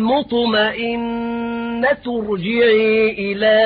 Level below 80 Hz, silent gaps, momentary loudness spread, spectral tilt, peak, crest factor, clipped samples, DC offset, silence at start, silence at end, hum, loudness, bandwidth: -48 dBFS; none; 9 LU; -10 dB/octave; -6 dBFS; 12 dB; under 0.1%; under 0.1%; 0 s; 0 s; none; -17 LUFS; 5 kHz